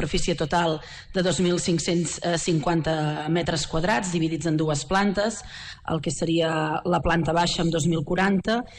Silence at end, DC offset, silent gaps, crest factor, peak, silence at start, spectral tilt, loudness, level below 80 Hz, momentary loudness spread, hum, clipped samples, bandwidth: 0 s; under 0.1%; none; 12 dB; -12 dBFS; 0 s; -5 dB/octave; -24 LUFS; -42 dBFS; 5 LU; none; under 0.1%; 10.5 kHz